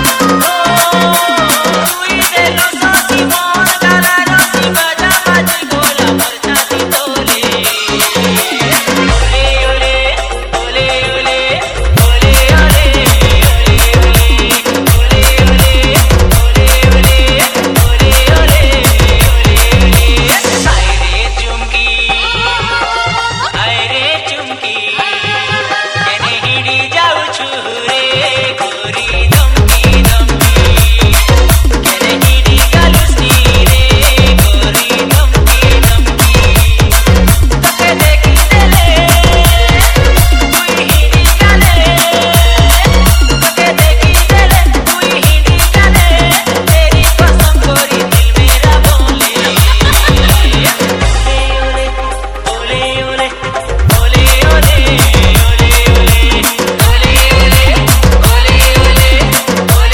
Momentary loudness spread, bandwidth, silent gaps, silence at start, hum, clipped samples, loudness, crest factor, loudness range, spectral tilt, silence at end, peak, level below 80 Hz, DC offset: 5 LU; over 20 kHz; none; 0 s; none; 3%; -8 LUFS; 8 dB; 4 LU; -3.5 dB/octave; 0 s; 0 dBFS; -10 dBFS; under 0.1%